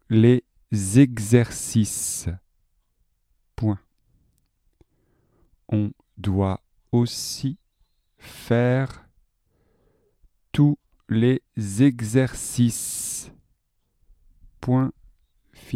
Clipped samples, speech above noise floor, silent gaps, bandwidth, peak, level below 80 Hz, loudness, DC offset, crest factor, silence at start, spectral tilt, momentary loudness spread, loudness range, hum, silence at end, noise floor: under 0.1%; 49 dB; none; 15.5 kHz; -2 dBFS; -52 dBFS; -23 LUFS; under 0.1%; 22 dB; 0.1 s; -6 dB/octave; 14 LU; 9 LU; none; 0 s; -70 dBFS